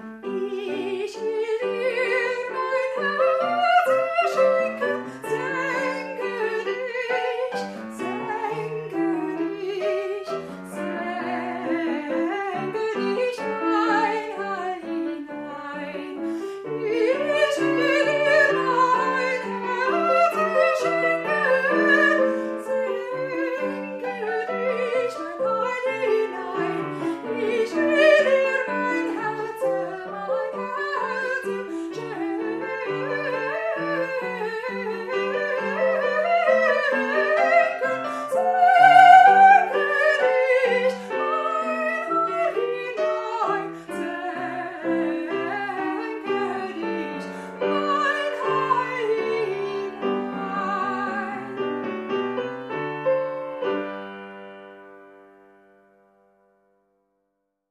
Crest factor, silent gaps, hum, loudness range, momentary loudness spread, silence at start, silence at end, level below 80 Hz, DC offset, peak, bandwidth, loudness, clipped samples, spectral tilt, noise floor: 22 dB; none; none; 11 LU; 11 LU; 0 s; 2.6 s; -70 dBFS; under 0.1%; 0 dBFS; 13.5 kHz; -23 LUFS; under 0.1%; -5 dB/octave; -76 dBFS